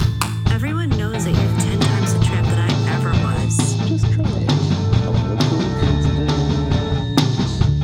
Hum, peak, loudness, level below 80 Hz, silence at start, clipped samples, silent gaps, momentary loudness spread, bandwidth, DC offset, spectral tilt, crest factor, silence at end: none; -2 dBFS; -18 LUFS; -28 dBFS; 0 s; under 0.1%; none; 2 LU; 15.5 kHz; under 0.1%; -6 dB/octave; 16 dB; 0 s